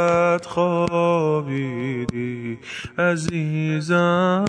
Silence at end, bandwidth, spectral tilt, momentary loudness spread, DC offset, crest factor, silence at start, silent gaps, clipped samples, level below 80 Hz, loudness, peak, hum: 0 s; 10 kHz; -6.5 dB/octave; 10 LU; under 0.1%; 14 dB; 0 s; none; under 0.1%; -54 dBFS; -22 LUFS; -6 dBFS; none